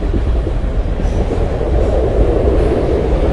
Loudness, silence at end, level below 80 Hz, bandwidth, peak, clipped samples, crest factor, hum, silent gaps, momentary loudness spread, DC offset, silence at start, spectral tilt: -16 LUFS; 0 s; -16 dBFS; 9.6 kHz; 0 dBFS; under 0.1%; 14 dB; none; none; 5 LU; under 0.1%; 0 s; -8.5 dB/octave